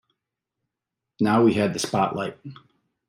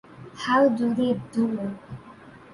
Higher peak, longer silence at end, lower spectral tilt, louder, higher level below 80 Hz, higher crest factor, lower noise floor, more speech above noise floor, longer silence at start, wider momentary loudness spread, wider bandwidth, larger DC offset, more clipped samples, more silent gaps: about the same, -6 dBFS vs -8 dBFS; first, 0.55 s vs 0.15 s; about the same, -5.5 dB/octave vs -6.5 dB/octave; about the same, -23 LUFS vs -24 LUFS; about the same, -66 dBFS vs -62 dBFS; about the same, 18 dB vs 18 dB; first, -85 dBFS vs -47 dBFS; first, 63 dB vs 24 dB; first, 1.2 s vs 0.1 s; second, 19 LU vs 22 LU; first, 15.5 kHz vs 11 kHz; neither; neither; neither